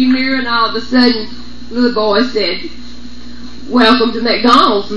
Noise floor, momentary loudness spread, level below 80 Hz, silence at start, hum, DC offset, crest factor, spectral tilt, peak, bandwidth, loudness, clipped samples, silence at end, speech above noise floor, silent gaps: -32 dBFS; 23 LU; -40 dBFS; 0 s; 60 Hz at -35 dBFS; 7%; 14 dB; -4.5 dB/octave; 0 dBFS; 9.6 kHz; -12 LUFS; 0.2%; 0 s; 20 dB; none